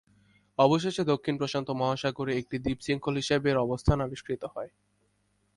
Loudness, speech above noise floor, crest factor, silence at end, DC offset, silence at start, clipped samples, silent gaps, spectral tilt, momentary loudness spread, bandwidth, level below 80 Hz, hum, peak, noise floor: -29 LUFS; 44 dB; 22 dB; 0.9 s; under 0.1%; 0.6 s; under 0.1%; none; -6 dB/octave; 11 LU; 11.5 kHz; -46 dBFS; 50 Hz at -60 dBFS; -8 dBFS; -72 dBFS